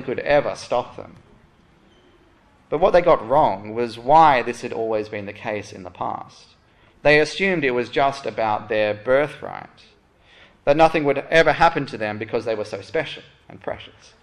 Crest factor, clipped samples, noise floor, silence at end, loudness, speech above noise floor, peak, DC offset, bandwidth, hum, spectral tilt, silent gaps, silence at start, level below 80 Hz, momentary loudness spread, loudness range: 18 dB; under 0.1%; -55 dBFS; 0.35 s; -20 LUFS; 35 dB; -2 dBFS; under 0.1%; 11.5 kHz; none; -5.5 dB/octave; none; 0 s; -48 dBFS; 16 LU; 4 LU